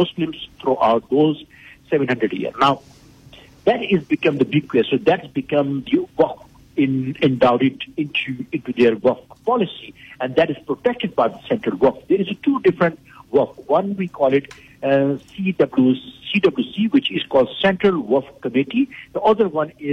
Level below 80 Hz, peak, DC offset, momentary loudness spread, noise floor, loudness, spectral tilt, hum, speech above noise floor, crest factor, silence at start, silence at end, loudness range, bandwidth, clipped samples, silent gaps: -56 dBFS; -6 dBFS; under 0.1%; 8 LU; -45 dBFS; -19 LUFS; -7.5 dB/octave; none; 27 dB; 14 dB; 0 s; 0 s; 2 LU; 7.6 kHz; under 0.1%; none